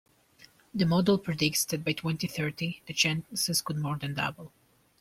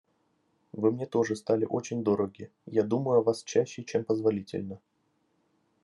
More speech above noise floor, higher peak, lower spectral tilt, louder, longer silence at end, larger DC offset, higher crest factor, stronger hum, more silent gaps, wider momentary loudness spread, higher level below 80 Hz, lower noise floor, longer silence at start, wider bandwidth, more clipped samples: second, 30 dB vs 45 dB; about the same, -10 dBFS vs -12 dBFS; second, -4 dB/octave vs -6.5 dB/octave; about the same, -29 LUFS vs -29 LUFS; second, 0.55 s vs 1.05 s; neither; about the same, 20 dB vs 18 dB; neither; neither; second, 7 LU vs 12 LU; first, -62 dBFS vs -78 dBFS; second, -59 dBFS vs -73 dBFS; about the same, 0.75 s vs 0.75 s; first, 16.5 kHz vs 11.5 kHz; neither